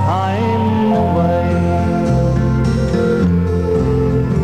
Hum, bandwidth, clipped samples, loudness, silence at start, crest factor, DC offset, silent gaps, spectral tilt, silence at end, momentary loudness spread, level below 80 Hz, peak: none; 9.4 kHz; under 0.1%; -15 LUFS; 0 s; 10 dB; 1%; none; -8.5 dB/octave; 0 s; 2 LU; -26 dBFS; -4 dBFS